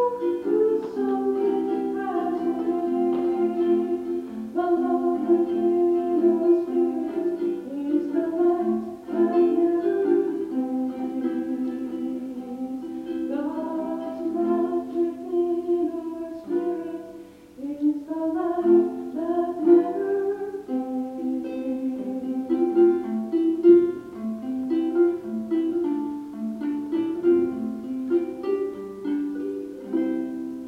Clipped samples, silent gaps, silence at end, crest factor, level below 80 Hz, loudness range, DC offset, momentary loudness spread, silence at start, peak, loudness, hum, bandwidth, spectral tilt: under 0.1%; none; 0 s; 18 dB; -64 dBFS; 6 LU; under 0.1%; 11 LU; 0 s; -6 dBFS; -25 LUFS; none; 4.5 kHz; -8 dB/octave